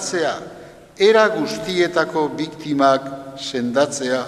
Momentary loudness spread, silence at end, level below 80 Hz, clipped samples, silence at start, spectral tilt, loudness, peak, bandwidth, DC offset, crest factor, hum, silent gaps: 13 LU; 0 s; -58 dBFS; under 0.1%; 0 s; -4 dB/octave; -19 LUFS; -2 dBFS; 13.5 kHz; under 0.1%; 18 dB; none; none